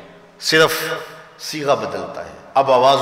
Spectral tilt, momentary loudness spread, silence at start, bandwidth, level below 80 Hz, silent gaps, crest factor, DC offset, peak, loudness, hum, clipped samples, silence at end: -3 dB/octave; 17 LU; 0 s; 16 kHz; -58 dBFS; none; 14 dB; under 0.1%; -4 dBFS; -18 LUFS; none; under 0.1%; 0 s